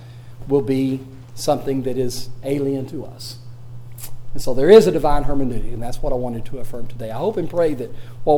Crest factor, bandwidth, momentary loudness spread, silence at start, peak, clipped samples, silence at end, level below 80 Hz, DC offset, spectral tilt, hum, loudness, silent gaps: 18 dB; 17 kHz; 18 LU; 0 s; 0 dBFS; under 0.1%; 0 s; -32 dBFS; under 0.1%; -6.5 dB/octave; none; -20 LUFS; none